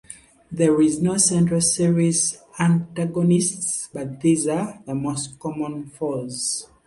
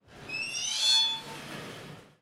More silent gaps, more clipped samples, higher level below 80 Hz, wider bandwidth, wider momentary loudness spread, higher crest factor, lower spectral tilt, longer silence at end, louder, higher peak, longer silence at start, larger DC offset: neither; neither; first, -56 dBFS vs -66 dBFS; second, 11.5 kHz vs 16 kHz; second, 11 LU vs 21 LU; about the same, 18 dB vs 20 dB; first, -5 dB/octave vs 0 dB/octave; about the same, 0.2 s vs 0.15 s; first, -21 LUFS vs -26 LUFS; first, -4 dBFS vs -12 dBFS; about the same, 0.1 s vs 0.1 s; neither